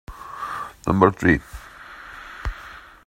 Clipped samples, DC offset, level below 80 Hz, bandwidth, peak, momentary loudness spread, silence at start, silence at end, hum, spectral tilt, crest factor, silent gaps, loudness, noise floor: under 0.1%; under 0.1%; -40 dBFS; 16 kHz; 0 dBFS; 23 LU; 0.1 s; 0.25 s; none; -7 dB/octave; 24 dB; none; -22 LUFS; -42 dBFS